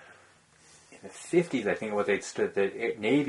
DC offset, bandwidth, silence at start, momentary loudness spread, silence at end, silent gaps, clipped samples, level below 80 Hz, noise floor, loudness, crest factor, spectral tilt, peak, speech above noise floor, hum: under 0.1%; 11.5 kHz; 0 s; 16 LU; 0 s; none; under 0.1%; -70 dBFS; -59 dBFS; -29 LUFS; 18 dB; -5 dB/octave; -12 dBFS; 31 dB; none